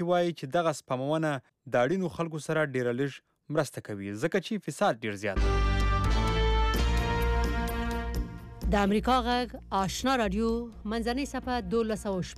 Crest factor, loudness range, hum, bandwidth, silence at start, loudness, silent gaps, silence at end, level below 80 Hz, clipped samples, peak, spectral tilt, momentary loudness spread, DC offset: 14 dB; 2 LU; none; 14.5 kHz; 0 s; -30 LUFS; none; 0 s; -34 dBFS; under 0.1%; -16 dBFS; -5.5 dB/octave; 8 LU; under 0.1%